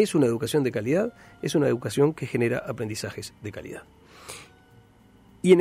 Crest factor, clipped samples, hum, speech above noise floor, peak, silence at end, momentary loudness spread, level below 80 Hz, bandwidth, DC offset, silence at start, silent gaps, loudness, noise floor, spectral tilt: 20 dB; under 0.1%; none; 30 dB; -6 dBFS; 0 s; 18 LU; -60 dBFS; 15.5 kHz; under 0.1%; 0 s; none; -26 LUFS; -55 dBFS; -6 dB/octave